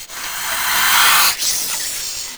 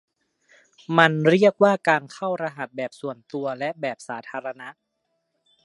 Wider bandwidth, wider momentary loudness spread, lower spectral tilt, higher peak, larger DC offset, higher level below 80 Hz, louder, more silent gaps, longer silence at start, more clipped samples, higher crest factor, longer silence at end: first, over 20 kHz vs 11.5 kHz; second, 12 LU vs 17 LU; second, 2 dB/octave vs -6 dB/octave; about the same, 0 dBFS vs 0 dBFS; first, 0.3% vs under 0.1%; first, -50 dBFS vs -74 dBFS; first, -14 LUFS vs -22 LUFS; neither; second, 0 s vs 0.9 s; neither; second, 18 dB vs 24 dB; second, 0 s vs 0.95 s